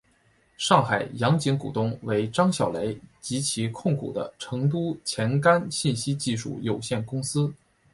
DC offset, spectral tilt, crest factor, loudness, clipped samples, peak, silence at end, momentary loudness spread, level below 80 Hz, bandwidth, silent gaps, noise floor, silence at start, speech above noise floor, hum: under 0.1%; -5 dB/octave; 22 dB; -26 LUFS; under 0.1%; -4 dBFS; 0.4 s; 9 LU; -60 dBFS; 11.5 kHz; none; -63 dBFS; 0.6 s; 38 dB; none